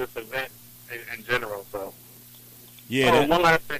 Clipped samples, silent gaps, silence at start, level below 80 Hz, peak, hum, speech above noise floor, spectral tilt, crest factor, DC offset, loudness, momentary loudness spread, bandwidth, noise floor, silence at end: under 0.1%; none; 0 s; -52 dBFS; -8 dBFS; 60 Hz at -55 dBFS; 27 dB; -4.5 dB/octave; 18 dB; under 0.1%; -24 LUFS; 26 LU; 15.5 kHz; -48 dBFS; 0 s